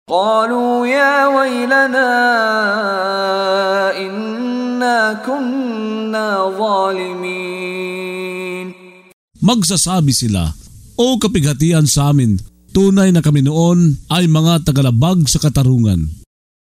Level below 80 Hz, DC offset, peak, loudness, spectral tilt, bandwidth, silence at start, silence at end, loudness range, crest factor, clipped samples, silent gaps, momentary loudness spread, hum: -36 dBFS; under 0.1%; 0 dBFS; -14 LUFS; -5 dB/octave; 16 kHz; 0.1 s; 0.45 s; 6 LU; 14 dB; under 0.1%; 9.13-9.28 s; 10 LU; none